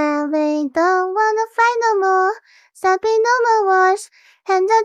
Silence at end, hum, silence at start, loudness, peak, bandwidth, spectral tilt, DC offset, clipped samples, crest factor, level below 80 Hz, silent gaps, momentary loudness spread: 0 s; none; 0 s; -17 LUFS; -4 dBFS; 12 kHz; -2 dB/octave; under 0.1%; under 0.1%; 14 dB; -70 dBFS; none; 6 LU